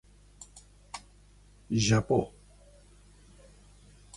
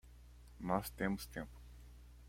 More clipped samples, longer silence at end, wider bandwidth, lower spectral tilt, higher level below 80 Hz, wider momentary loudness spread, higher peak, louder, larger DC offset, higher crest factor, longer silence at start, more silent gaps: neither; first, 1.9 s vs 0 s; second, 11.5 kHz vs 16.5 kHz; about the same, -5 dB/octave vs -5.5 dB/octave; about the same, -54 dBFS vs -56 dBFS; first, 25 LU vs 22 LU; first, -14 dBFS vs -20 dBFS; first, -28 LUFS vs -42 LUFS; neither; about the same, 20 dB vs 24 dB; first, 0.55 s vs 0.05 s; neither